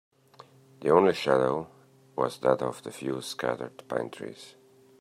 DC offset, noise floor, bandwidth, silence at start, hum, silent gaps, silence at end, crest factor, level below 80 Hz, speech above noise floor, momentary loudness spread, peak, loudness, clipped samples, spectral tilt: under 0.1%; -55 dBFS; 15 kHz; 0.4 s; none; none; 0.5 s; 22 dB; -70 dBFS; 27 dB; 18 LU; -6 dBFS; -28 LUFS; under 0.1%; -5.5 dB/octave